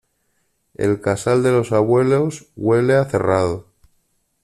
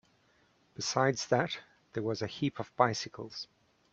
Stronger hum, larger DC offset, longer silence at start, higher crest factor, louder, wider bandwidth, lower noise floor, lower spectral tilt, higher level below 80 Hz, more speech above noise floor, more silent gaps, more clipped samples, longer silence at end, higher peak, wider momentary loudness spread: neither; neither; about the same, 0.8 s vs 0.8 s; second, 16 dB vs 24 dB; first, -18 LUFS vs -33 LUFS; first, 13 kHz vs 8.2 kHz; about the same, -67 dBFS vs -69 dBFS; first, -7 dB/octave vs -4.5 dB/octave; first, -52 dBFS vs -70 dBFS; first, 50 dB vs 36 dB; neither; neither; first, 0.85 s vs 0.5 s; first, -4 dBFS vs -10 dBFS; second, 8 LU vs 13 LU